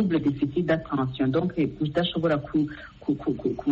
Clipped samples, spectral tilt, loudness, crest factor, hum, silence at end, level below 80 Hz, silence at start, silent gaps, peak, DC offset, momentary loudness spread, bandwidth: under 0.1%; -6 dB/octave; -26 LUFS; 14 dB; none; 0 s; -52 dBFS; 0 s; none; -10 dBFS; under 0.1%; 4 LU; 7 kHz